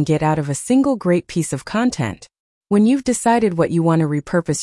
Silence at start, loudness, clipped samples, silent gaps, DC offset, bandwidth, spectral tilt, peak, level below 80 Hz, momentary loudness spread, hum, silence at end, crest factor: 0 s; -18 LUFS; under 0.1%; 2.39-2.61 s; under 0.1%; 12 kHz; -6 dB/octave; -4 dBFS; -50 dBFS; 7 LU; none; 0 s; 12 dB